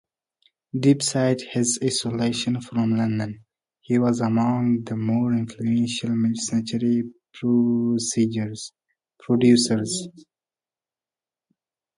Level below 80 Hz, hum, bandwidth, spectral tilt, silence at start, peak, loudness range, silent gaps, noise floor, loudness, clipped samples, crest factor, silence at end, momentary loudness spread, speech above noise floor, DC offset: -62 dBFS; none; 11.5 kHz; -5 dB/octave; 0.75 s; -6 dBFS; 2 LU; none; under -90 dBFS; -23 LUFS; under 0.1%; 18 dB; 1.8 s; 10 LU; over 68 dB; under 0.1%